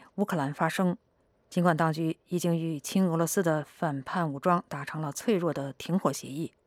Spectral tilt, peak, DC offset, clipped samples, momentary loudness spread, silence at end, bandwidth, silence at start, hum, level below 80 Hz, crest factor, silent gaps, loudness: -6 dB/octave; -10 dBFS; under 0.1%; under 0.1%; 8 LU; 0.2 s; 16 kHz; 0.15 s; none; -72 dBFS; 20 dB; none; -29 LUFS